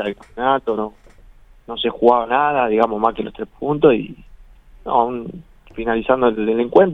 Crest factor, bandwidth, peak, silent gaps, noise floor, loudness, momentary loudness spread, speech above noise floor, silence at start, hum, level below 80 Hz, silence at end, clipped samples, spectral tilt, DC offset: 18 dB; 4.6 kHz; 0 dBFS; none; -45 dBFS; -18 LUFS; 15 LU; 28 dB; 0 s; none; -46 dBFS; 0 s; under 0.1%; -8 dB/octave; under 0.1%